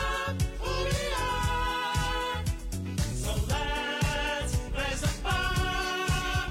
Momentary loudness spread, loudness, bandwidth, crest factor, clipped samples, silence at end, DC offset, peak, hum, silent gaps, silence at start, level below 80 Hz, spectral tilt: 4 LU; -30 LUFS; 16 kHz; 12 dB; under 0.1%; 0 s; under 0.1%; -16 dBFS; none; none; 0 s; -34 dBFS; -4 dB/octave